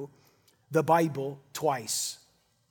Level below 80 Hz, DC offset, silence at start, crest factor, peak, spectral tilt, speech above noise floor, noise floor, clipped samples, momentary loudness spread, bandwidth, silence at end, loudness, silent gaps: -78 dBFS; under 0.1%; 0 s; 20 dB; -10 dBFS; -4 dB/octave; 36 dB; -65 dBFS; under 0.1%; 14 LU; 19 kHz; 0.55 s; -29 LUFS; none